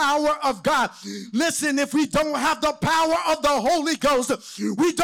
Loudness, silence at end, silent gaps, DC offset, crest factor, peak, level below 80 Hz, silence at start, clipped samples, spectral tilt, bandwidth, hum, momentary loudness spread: -22 LUFS; 0 s; none; under 0.1%; 8 dB; -14 dBFS; -50 dBFS; 0 s; under 0.1%; -3.5 dB/octave; 19 kHz; none; 7 LU